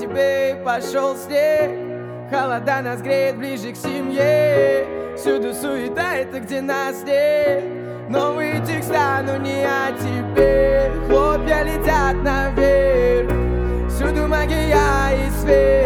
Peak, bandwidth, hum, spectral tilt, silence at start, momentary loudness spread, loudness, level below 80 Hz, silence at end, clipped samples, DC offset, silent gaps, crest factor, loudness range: -2 dBFS; 19 kHz; none; -6 dB/octave; 0 s; 8 LU; -19 LUFS; -28 dBFS; 0 s; under 0.1%; under 0.1%; none; 16 dB; 4 LU